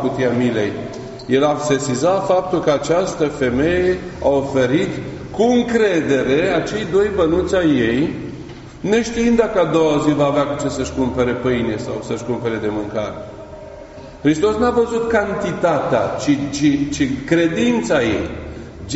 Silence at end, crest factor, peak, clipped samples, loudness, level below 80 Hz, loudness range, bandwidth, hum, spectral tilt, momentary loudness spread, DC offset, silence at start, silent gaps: 0 s; 16 dB; -2 dBFS; under 0.1%; -18 LUFS; -40 dBFS; 4 LU; 8 kHz; none; -5 dB/octave; 12 LU; under 0.1%; 0 s; none